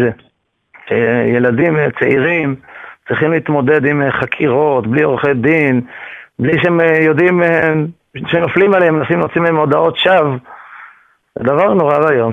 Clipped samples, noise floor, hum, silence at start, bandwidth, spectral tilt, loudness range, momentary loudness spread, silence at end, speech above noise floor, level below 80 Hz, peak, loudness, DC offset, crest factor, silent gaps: under 0.1%; -48 dBFS; none; 0 s; 6 kHz; -8.5 dB/octave; 2 LU; 10 LU; 0 s; 36 dB; -50 dBFS; 0 dBFS; -13 LUFS; under 0.1%; 14 dB; none